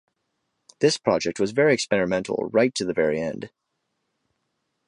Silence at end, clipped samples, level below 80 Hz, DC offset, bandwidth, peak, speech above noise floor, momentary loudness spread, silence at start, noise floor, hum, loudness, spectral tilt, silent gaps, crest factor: 1.4 s; under 0.1%; -60 dBFS; under 0.1%; 11.5 kHz; -6 dBFS; 54 dB; 8 LU; 0.8 s; -77 dBFS; none; -23 LUFS; -4.5 dB/octave; none; 20 dB